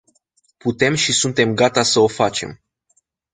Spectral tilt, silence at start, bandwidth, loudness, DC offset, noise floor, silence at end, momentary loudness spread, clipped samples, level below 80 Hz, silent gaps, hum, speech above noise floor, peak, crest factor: -3.5 dB/octave; 0.65 s; 9.6 kHz; -17 LUFS; under 0.1%; -65 dBFS; 0.8 s; 11 LU; under 0.1%; -54 dBFS; none; none; 48 dB; -2 dBFS; 18 dB